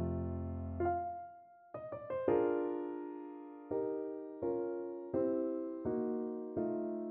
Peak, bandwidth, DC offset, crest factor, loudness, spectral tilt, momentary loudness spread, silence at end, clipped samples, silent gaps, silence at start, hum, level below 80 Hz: -18 dBFS; 3.4 kHz; under 0.1%; 20 dB; -39 LUFS; -9.5 dB/octave; 13 LU; 0 s; under 0.1%; none; 0 s; none; -60 dBFS